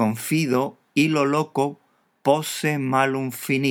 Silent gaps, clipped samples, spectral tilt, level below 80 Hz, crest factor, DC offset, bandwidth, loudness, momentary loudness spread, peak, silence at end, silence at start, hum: none; under 0.1%; -5 dB/octave; -78 dBFS; 18 dB; under 0.1%; 19.5 kHz; -22 LUFS; 5 LU; -4 dBFS; 0 s; 0 s; none